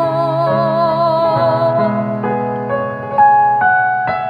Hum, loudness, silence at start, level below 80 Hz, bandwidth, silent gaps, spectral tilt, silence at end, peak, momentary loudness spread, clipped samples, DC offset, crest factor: none; -14 LUFS; 0 s; -52 dBFS; 5.2 kHz; none; -8.5 dB/octave; 0 s; -2 dBFS; 8 LU; under 0.1%; under 0.1%; 12 dB